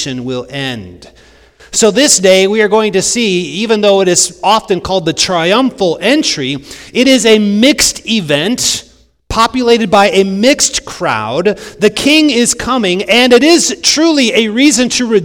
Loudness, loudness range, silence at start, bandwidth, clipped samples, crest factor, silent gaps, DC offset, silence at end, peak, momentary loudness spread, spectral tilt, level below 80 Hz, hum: -10 LUFS; 2 LU; 0 s; over 20 kHz; 1%; 10 dB; none; under 0.1%; 0 s; 0 dBFS; 9 LU; -3 dB/octave; -40 dBFS; none